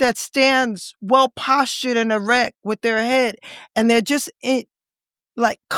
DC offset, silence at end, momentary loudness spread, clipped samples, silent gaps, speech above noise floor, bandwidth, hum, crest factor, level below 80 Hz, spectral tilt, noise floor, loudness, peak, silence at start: under 0.1%; 0 s; 8 LU; under 0.1%; none; over 71 dB; 17.5 kHz; none; 18 dB; -60 dBFS; -3 dB/octave; under -90 dBFS; -19 LUFS; -2 dBFS; 0 s